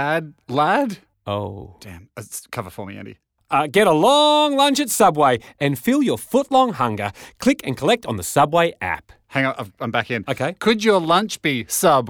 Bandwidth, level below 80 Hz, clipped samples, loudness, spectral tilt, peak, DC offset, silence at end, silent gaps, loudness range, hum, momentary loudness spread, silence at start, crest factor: over 20 kHz; -56 dBFS; under 0.1%; -19 LUFS; -4 dB/octave; -4 dBFS; under 0.1%; 0 s; none; 7 LU; none; 17 LU; 0 s; 14 dB